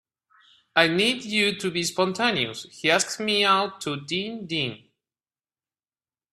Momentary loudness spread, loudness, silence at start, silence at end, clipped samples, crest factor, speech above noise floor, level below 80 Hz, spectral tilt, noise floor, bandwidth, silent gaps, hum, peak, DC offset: 9 LU; -23 LUFS; 0.75 s; 1.55 s; under 0.1%; 26 dB; over 66 dB; -66 dBFS; -3 dB/octave; under -90 dBFS; 14.5 kHz; none; none; -2 dBFS; under 0.1%